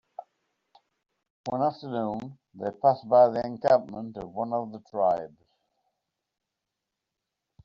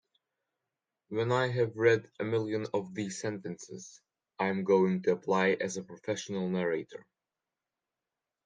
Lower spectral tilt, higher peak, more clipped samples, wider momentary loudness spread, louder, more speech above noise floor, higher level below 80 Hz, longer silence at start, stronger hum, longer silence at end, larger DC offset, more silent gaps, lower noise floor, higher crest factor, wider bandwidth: about the same, -6 dB/octave vs -5.5 dB/octave; first, -8 dBFS vs -12 dBFS; neither; first, 19 LU vs 15 LU; first, -26 LUFS vs -31 LUFS; about the same, 59 dB vs 59 dB; first, -68 dBFS vs -76 dBFS; second, 0.2 s vs 1.1 s; neither; first, 2.4 s vs 1.45 s; neither; first, 1.30-1.44 s vs none; second, -85 dBFS vs -90 dBFS; about the same, 20 dB vs 20 dB; second, 7.2 kHz vs 9.8 kHz